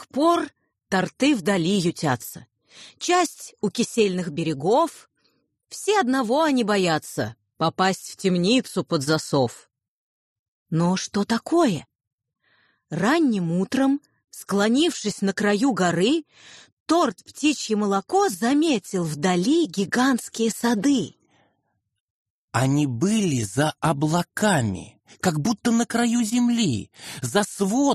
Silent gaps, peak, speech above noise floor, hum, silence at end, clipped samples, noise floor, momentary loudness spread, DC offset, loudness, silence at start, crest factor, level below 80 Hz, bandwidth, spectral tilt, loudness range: 9.88-10.66 s, 12.07-12.18 s, 16.72-16.86 s, 22.00-22.48 s; -6 dBFS; 52 dB; none; 0 s; under 0.1%; -74 dBFS; 8 LU; under 0.1%; -23 LUFS; 0 s; 16 dB; -62 dBFS; 13 kHz; -5 dB/octave; 3 LU